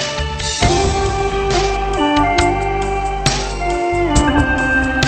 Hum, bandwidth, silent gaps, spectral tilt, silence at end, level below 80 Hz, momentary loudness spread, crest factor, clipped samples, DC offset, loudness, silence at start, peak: none; 9 kHz; none; -4.5 dB/octave; 0 s; -24 dBFS; 5 LU; 16 dB; under 0.1%; 0.1%; -16 LUFS; 0 s; 0 dBFS